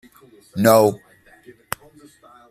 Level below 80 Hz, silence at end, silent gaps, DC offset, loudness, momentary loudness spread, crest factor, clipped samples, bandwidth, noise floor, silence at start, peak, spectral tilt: -60 dBFS; 1.55 s; none; under 0.1%; -16 LUFS; 19 LU; 22 dB; under 0.1%; 15.5 kHz; -50 dBFS; 0.55 s; 0 dBFS; -5.5 dB/octave